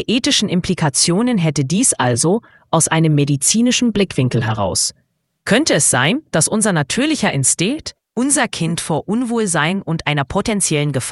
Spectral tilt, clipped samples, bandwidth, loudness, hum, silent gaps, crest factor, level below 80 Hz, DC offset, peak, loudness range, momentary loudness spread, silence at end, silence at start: -3.5 dB/octave; under 0.1%; 12 kHz; -16 LUFS; none; none; 16 dB; -46 dBFS; under 0.1%; 0 dBFS; 2 LU; 6 LU; 0 s; 0 s